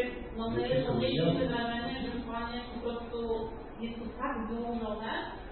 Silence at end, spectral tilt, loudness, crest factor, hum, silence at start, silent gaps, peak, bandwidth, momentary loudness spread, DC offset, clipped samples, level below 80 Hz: 0 s; -10 dB/octave; -34 LUFS; 18 dB; none; 0 s; none; -16 dBFS; 4.7 kHz; 9 LU; under 0.1%; under 0.1%; -48 dBFS